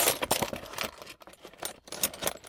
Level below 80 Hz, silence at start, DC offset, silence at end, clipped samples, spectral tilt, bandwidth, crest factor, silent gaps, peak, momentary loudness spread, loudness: -58 dBFS; 0 s; under 0.1%; 0 s; under 0.1%; -1.5 dB/octave; 19 kHz; 24 dB; none; -10 dBFS; 18 LU; -32 LUFS